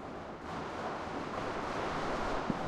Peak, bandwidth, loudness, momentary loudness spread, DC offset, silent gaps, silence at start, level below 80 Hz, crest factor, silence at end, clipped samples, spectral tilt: -18 dBFS; 13 kHz; -38 LUFS; 7 LU; under 0.1%; none; 0 s; -52 dBFS; 18 dB; 0 s; under 0.1%; -5.5 dB/octave